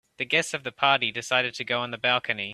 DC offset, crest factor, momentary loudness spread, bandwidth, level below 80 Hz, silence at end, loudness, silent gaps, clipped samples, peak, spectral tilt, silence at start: under 0.1%; 22 dB; 6 LU; 14 kHz; -70 dBFS; 0 s; -25 LUFS; none; under 0.1%; -4 dBFS; -2.5 dB/octave; 0.2 s